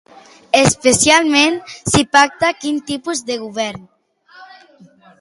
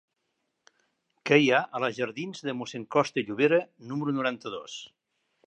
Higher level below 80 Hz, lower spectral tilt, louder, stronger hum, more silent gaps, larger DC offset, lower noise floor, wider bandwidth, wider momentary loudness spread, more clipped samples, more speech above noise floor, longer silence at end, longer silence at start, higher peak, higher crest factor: first, -44 dBFS vs -78 dBFS; second, -3 dB/octave vs -5 dB/octave; first, -14 LUFS vs -27 LUFS; neither; neither; neither; second, -47 dBFS vs -79 dBFS; first, 12 kHz vs 8.8 kHz; about the same, 13 LU vs 15 LU; neither; second, 32 dB vs 52 dB; first, 0.75 s vs 0.6 s; second, 0.55 s vs 1.25 s; first, 0 dBFS vs -6 dBFS; second, 16 dB vs 22 dB